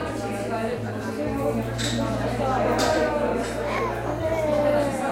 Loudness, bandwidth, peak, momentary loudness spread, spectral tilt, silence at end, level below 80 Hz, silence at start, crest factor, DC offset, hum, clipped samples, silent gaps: -25 LUFS; 16 kHz; -8 dBFS; 7 LU; -5.5 dB/octave; 0 s; -40 dBFS; 0 s; 16 dB; under 0.1%; none; under 0.1%; none